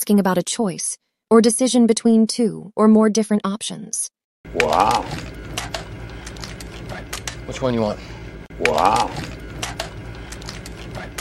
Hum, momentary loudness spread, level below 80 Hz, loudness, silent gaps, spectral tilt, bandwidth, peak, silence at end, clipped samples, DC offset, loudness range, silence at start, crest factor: none; 18 LU; -40 dBFS; -19 LUFS; 4.24-4.44 s; -4.5 dB/octave; 14 kHz; 0 dBFS; 0 s; under 0.1%; under 0.1%; 9 LU; 0 s; 20 dB